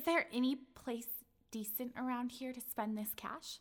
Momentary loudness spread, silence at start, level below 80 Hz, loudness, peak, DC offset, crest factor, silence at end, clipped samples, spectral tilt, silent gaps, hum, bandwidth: 9 LU; 0 s; -74 dBFS; -41 LUFS; -22 dBFS; under 0.1%; 18 dB; 0 s; under 0.1%; -3.5 dB/octave; none; none; over 20 kHz